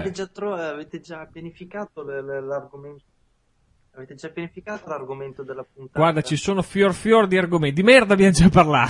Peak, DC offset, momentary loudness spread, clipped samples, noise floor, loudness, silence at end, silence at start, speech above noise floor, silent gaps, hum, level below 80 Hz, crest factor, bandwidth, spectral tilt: 0 dBFS; under 0.1%; 23 LU; under 0.1%; -64 dBFS; -18 LUFS; 0 s; 0 s; 43 dB; none; none; -42 dBFS; 20 dB; 11.5 kHz; -5.5 dB/octave